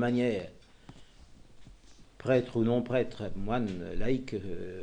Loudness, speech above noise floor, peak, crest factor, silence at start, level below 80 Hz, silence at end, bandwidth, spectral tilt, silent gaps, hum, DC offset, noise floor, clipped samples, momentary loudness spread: -32 LUFS; 24 dB; -14 dBFS; 18 dB; 0 s; -46 dBFS; 0 s; 9.4 kHz; -7.5 dB/octave; none; none; under 0.1%; -54 dBFS; under 0.1%; 11 LU